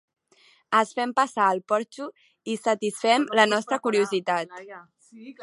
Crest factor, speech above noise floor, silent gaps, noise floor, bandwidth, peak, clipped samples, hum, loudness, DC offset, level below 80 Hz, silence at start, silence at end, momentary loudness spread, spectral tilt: 22 dB; 36 dB; none; -60 dBFS; 11.5 kHz; -2 dBFS; under 0.1%; none; -24 LUFS; under 0.1%; -82 dBFS; 0.7 s; 0 s; 17 LU; -3.5 dB/octave